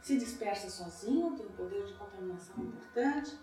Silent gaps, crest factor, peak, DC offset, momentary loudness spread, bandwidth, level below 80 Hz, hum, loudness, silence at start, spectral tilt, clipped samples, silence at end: none; 16 dB; -20 dBFS; under 0.1%; 10 LU; 14.5 kHz; -66 dBFS; none; -37 LUFS; 0 s; -4.5 dB/octave; under 0.1%; 0 s